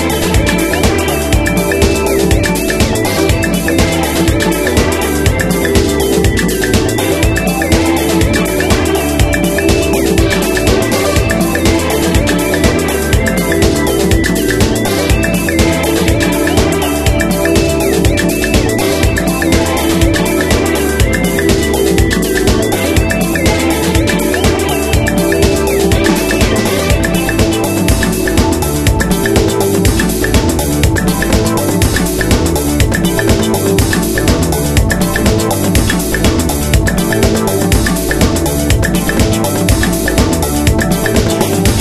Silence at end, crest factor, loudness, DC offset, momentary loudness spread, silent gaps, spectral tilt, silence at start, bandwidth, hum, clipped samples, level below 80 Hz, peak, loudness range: 0 s; 12 dB; -12 LUFS; 0.5%; 1 LU; none; -5 dB/octave; 0 s; 13.5 kHz; none; under 0.1%; -20 dBFS; 0 dBFS; 0 LU